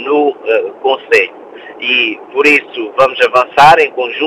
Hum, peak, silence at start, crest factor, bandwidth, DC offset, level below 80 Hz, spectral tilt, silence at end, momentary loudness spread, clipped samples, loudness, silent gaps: none; 0 dBFS; 0 s; 12 dB; 15.5 kHz; under 0.1%; -50 dBFS; -3.5 dB/octave; 0 s; 9 LU; 0.6%; -11 LUFS; none